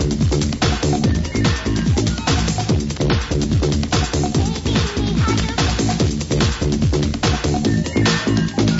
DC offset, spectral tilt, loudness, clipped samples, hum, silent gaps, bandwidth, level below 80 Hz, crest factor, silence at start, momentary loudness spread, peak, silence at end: under 0.1%; -5 dB/octave; -18 LUFS; under 0.1%; none; none; 8 kHz; -26 dBFS; 14 dB; 0 s; 2 LU; -4 dBFS; 0 s